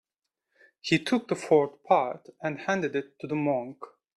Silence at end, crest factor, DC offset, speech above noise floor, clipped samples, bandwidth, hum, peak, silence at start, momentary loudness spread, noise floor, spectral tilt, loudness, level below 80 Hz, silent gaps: 0.3 s; 20 dB; under 0.1%; 57 dB; under 0.1%; 12 kHz; none; -8 dBFS; 0.85 s; 11 LU; -84 dBFS; -5.5 dB/octave; -28 LUFS; -70 dBFS; none